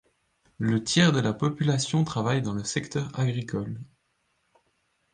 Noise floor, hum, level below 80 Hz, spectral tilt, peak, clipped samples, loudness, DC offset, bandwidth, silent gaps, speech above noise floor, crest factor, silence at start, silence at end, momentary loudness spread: -73 dBFS; none; -58 dBFS; -5 dB/octave; -6 dBFS; under 0.1%; -26 LUFS; under 0.1%; 10 kHz; none; 47 dB; 22 dB; 0.6 s; 1.3 s; 11 LU